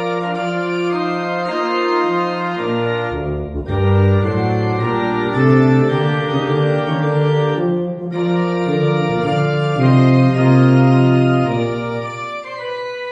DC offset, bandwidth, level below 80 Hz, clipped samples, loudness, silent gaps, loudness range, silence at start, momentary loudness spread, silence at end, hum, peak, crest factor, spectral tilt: under 0.1%; 8 kHz; -42 dBFS; under 0.1%; -16 LUFS; none; 5 LU; 0 s; 11 LU; 0 s; none; 0 dBFS; 14 dB; -8.5 dB/octave